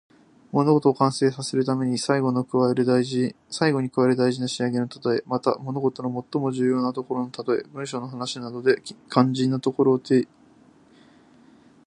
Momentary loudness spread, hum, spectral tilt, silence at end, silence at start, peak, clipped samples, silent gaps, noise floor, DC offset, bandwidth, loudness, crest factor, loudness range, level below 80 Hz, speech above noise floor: 8 LU; none; -6 dB/octave; 1.6 s; 0.55 s; -2 dBFS; under 0.1%; none; -54 dBFS; under 0.1%; 11 kHz; -24 LUFS; 22 dB; 4 LU; -68 dBFS; 32 dB